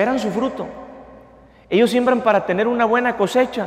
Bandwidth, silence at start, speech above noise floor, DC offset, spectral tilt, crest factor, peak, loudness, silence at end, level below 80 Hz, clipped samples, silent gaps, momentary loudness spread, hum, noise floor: 14.5 kHz; 0 s; 29 dB; under 0.1%; -5.5 dB/octave; 16 dB; -4 dBFS; -18 LUFS; 0 s; -54 dBFS; under 0.1%; none; 15 LU; none; -47 dBFS